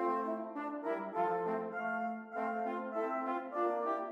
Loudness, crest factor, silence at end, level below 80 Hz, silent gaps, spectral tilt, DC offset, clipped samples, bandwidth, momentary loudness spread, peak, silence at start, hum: -37 LUFS; 14 dB; 0 s; under -90 dBFS; none; -7.5 dB/octave; under 0.1%; under 0.1%; 8.2 kHz; 5 LU; -22 dBFS; 0 s; none